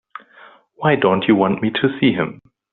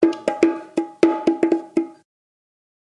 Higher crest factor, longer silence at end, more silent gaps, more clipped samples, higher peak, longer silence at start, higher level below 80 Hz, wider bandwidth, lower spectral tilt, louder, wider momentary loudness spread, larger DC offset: about the same, 18 dB vs 20 dB; second, 0.4 s vs 0.9 s; neither; neither; about the same, -2 dBFS vs 0 dBFS; first, 0.8 s vs 0 s; first, -58 dBFS vs -70 dBFS; second, 4.3 kHz vs 10.5 kHz; second, -4.5 dB/octave vs -6 dB/octave; first, -17 LUFS vs -21 LUFS; about the same, 9 LU vs 8 LU; neither